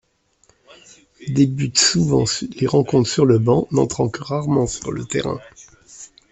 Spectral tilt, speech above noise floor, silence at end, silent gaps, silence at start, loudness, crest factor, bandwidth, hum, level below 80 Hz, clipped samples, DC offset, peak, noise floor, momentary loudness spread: -5 dB/octave; 42 dB; 0.25 s; none; 1.2 s; -18 LUFS; 18 dB; 8.4 kHz; none; -48 dBFS; under 0.1%; under 0.1%; -2 dBFS; -60 dBFS; 14 LU